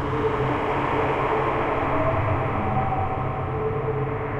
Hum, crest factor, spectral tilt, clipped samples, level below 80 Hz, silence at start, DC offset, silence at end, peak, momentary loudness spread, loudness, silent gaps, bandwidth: none; 12 dB; -8.5 dB/octave; under 0.1%; -40 dBFS; 0 s; under 0.1%; 0 s; -10 dBFS; 4 LU; -24 LUFS; none; 8.2 kHz